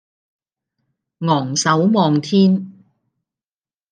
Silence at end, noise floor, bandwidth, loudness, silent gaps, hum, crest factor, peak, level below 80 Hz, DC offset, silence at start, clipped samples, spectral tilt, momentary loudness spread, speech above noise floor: 1.2 s; under -90 dBFS; 9.8 kHz; -16 LUFS; none; none; 18 dB; -2 dBFS; -68 dBFS; under 0.1%; 1.2 s; under 0.1%; -5.5 dB/octave; 9 LU; over 75 dB